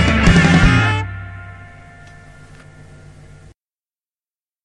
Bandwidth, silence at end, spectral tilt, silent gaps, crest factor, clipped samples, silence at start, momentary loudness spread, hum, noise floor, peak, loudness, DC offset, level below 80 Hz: 10.5 kHz; 3 s; -6 dB/octave; none; 18 dB; under 0.1%; 0 s; 23 LU; none; under -90 dBFS; 0 dBFS; -13 LUFS; under 0.1%; -26 dBFS